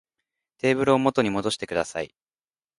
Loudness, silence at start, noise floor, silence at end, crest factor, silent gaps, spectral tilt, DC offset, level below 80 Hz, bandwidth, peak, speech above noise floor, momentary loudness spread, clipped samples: -24 LUFS; 0.65 s; under -90 dBFS; 0.7 s; 20 dB; none; -5 dB/octave; under 0.1%; -58 dBFS; 11.5 kHz; -4 dBFS; over 67 dB; 11 LU; under 0.1%